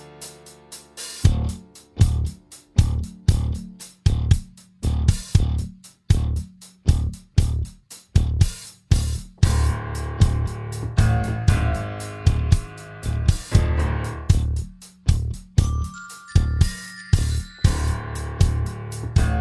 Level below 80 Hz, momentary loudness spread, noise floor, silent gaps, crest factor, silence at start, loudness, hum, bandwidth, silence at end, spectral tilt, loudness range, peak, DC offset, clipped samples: -26 dBFS; 14 LU; -43 dBFS; none; 20 dB; 0 s; -23 LUFS; none; 12 kHz; 0 s; -6 dB/octave; 2 LU; -2 dBFS; under 0.1%; under 0.1%